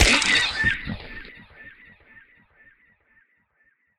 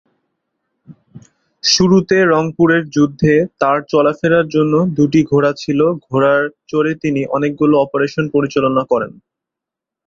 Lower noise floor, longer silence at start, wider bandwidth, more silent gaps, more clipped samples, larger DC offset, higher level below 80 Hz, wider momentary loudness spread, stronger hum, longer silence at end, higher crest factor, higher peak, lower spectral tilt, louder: second, -66 dBFS vs -84 dBFS; second, 0 s vs 0.9 s; first, 16 kHz vs 7.6 kHz; neither; neither; neither; first, -36 dBFS vs -50 dBFS; first, 28 LU vs 6 LU; neither; first, 2.3 s vs 0.95 s; first, 26 dB vs 14 dB; about the same, 0 dBFS vs 0 dBFS; second, -2 dB/octave vs -5.5 dB/octave; second, -20 LUFS vs -14 LUFS